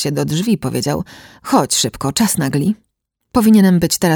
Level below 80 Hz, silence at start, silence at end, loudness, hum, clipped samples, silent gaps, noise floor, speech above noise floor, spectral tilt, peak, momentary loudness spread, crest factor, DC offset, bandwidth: -44 dBFS; 0 s; 0 s; -15 LUFS; none; under 0.1%; none; -45 dBFS; 30 dB; -4.5 dB/octave; 0 dBFS; 12 LU; 14 dB; under 0.1%; over 20 kHz